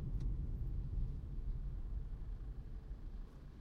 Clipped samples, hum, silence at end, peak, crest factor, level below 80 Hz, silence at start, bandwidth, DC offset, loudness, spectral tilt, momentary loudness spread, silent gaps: under 0.1%; none; 0 s; -28 dBFS; 14 dB; -44 dBFS; 0 s; 4.6 kHz; under 0.1%; -47 LUFS; -9.5 dB/octave; 9 LU; none